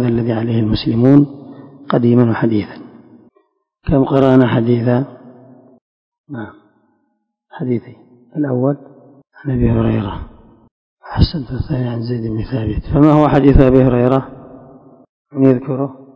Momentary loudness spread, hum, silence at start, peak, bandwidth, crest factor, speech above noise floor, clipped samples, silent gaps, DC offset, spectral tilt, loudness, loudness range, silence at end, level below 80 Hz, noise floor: 19 LU; none; 0 s; 0 dBFS; 5.4 kHz; 16 dB; 54 dB; 0.4%; 5.81-6.12 s, 6.18-6.24 s, 10.71-10.97 s, 15.09-15.25 s; under 0.1%; -10 dB/octave; -15 LUFS; 10 LU; 0.15 s; -30 dBFS; -68 dBFS